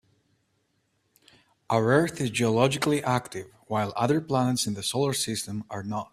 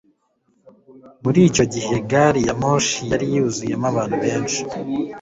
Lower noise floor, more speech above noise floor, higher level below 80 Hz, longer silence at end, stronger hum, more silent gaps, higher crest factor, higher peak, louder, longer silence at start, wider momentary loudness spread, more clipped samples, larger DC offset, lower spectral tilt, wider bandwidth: first, -72 dBFS vs -65 dBFS; about the same, 47 dB vs 46 dB; second, -62 dBFS vs -48 dBFS; about the same, 0.05 s vs 0 s; neither; neither; about the same, 20 dB vs 18 dB; second, -6 dBFS vs -2 dBFS; second, -26 LUFS vs -19 LUFS; first, 1.7 s vs 0.9 s; about the same, 10 LU vs 9 LU; neither; neither; about the same, -5 dB/octave vs -5 dB/octave; first, 15 kHz vs 8 kHz